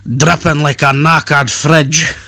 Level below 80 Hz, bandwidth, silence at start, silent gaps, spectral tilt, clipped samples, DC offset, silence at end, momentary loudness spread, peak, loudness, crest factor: -38 dBFS; 12.5 kHz; 0.05 s; none; -4 dB/octave; 1%; under 0.1%; 0.05 s; 3 LU; 0 dBFS; -10 LUFS; 10 dB